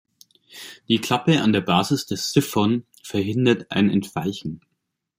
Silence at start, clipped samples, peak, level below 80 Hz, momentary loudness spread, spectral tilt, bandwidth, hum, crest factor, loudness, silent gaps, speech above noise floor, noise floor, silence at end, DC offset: 0.55 s; under 0.1%; -2 dBFS; -60 dBFS; 15 LU; -5.5 dB/octave; 16 kHz; none; 20 dB; -21 LUFS; none; 56 dB; -77 dBFS; 0.6 s; under 0.1%